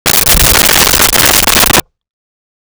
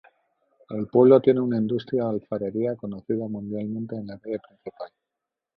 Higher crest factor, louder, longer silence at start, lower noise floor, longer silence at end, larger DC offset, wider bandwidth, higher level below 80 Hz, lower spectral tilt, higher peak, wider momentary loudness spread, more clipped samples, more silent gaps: second, 10 dB vs 20 dB; first, -5 LUFS vs -24 LUFS; second, 0.05 s vs 0.7 s; first, under -90 dBFS vs -86 dBFS; first, 1 s vs 0.7 s; neither; first, over 20 kHz vs 5 kHz; first, -22 dBFS vs -64 dBFS; second, -1 dB/octave vs -11 dB/octave; first, 0 dBFS vs -4 dBFS; second, 2 LU vs 21 LU; neither; neither